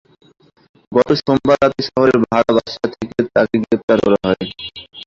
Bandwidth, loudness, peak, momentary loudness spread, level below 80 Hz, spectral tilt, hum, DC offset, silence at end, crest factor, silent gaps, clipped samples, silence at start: 7.6 kHz; -16 LUFS; 0 dBFS; 9 LU; -48 dBFS; -6.5 dB/octave; none; under 0.1%; 0.05 s; 16 dB; 3.83-3.88 s; under 0.1%; 0.9 s